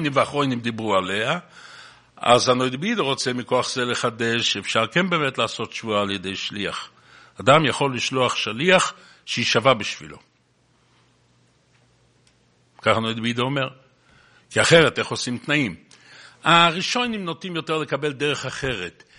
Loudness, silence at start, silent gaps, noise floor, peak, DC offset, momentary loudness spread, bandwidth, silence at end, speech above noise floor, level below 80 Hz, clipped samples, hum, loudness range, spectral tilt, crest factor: -21 LUFS; 0 s; none; -62 dBFS; 0 dBFS; under 0.1%; 12 LU; 10.5 kHz; 0.3 s; 41 dB; -58 dBFS; under 0.1%; none; 7 LU; -4 dB/octave; 22 dB